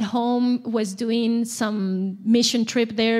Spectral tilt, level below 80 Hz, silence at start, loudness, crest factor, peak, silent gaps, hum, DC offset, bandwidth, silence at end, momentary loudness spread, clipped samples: -4.5 dB/octave; -72 dBFS; 0 s; -22 LUFS; 14 dB; -8 dBFS; none; none; under 0.1%; 15 kHz; 0 s; 6 LU; under 0.1%